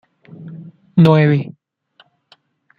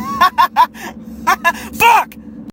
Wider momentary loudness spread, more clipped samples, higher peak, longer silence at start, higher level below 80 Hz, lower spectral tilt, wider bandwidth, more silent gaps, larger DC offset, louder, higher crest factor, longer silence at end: first, 26 LU vs 19 LU; neither; about the same, -2 dBFS vs 0 dBFS; first, 0.4 s vs 0 s; second, -56 dBFS vs -44 dBFS; first, -9.5 dB/octave vs -2.5 dB/octave; second, 5 kHz vs 17 kHz; neither; neither; about the same, -14 LUFS vs -13 LUFS; about the same, 16 dB vs 14 dB; first, 1.3 s vs 0 s